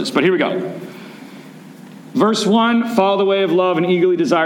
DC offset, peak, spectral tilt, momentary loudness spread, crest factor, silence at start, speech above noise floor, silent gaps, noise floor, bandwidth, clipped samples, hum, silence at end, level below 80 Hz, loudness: under 0.1%; -2 dBFS; -5.5 dB/octave; 20 LU; 16 dB; 0 s; 22 dB; none; -38 dBFS; 16.5 kHz; under 0.1%; none; 0 s; -70 dBFS; -16 LUFS